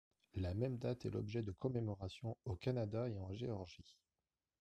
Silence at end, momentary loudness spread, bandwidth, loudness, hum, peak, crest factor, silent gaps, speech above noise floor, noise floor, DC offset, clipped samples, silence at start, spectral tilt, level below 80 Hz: 0.7 s; 7 LU; 9 kHz; -44 LUFS; none; -26 dBFS; 18 dB; none; over 47 dB; under -90 dBFS; under 0.1%; under 0.1%; 0.35 s; -8 dB/octave; -66 dBFS